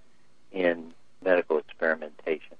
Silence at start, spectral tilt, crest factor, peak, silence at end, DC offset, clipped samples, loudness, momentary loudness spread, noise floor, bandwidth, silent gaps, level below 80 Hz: 0.55 s; -6.5 dB/octave; 20 dB; -8 dBFS; 0.2 s; 0.4%; under 0.1%; -28 LUFS; 12 LU; -65 dBFS; 5.2 kHz; none; -76 dBFS